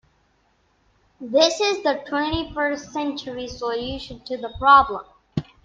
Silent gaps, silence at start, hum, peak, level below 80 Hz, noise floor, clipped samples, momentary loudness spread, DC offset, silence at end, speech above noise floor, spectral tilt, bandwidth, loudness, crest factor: none; 1.2 s; none; -2 dBFS; -46 dBFS; -64 dBFS; under 0.1%; 17 LU; under 0.1%; 0.25 s; 42 dB; -4 dB/octave; 9.2 kHz; -22 LUFS; 22 dB